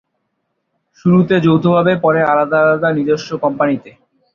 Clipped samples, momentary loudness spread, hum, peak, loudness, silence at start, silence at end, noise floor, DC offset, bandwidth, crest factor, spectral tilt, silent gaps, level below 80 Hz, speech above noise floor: under 0.1%; 6 LU; none; -2 dBFS; -14 LUFS; 1.05 s; 0.45 s; -70 dBFS; under 0.1%; 7 kHz; 14 dB; -8 dB/octave; none; -54 dBFS; 57 dB